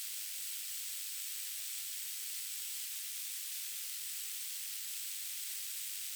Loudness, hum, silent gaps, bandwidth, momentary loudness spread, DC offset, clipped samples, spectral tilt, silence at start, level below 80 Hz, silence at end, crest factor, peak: -38 LUFS; none; none; over 20 kHz; 0 LU; under 0.1%; under 0.1%; 10 dB/octave; 0 s; under -90 dBFS; 0 s; 16 dB; -26 dBFS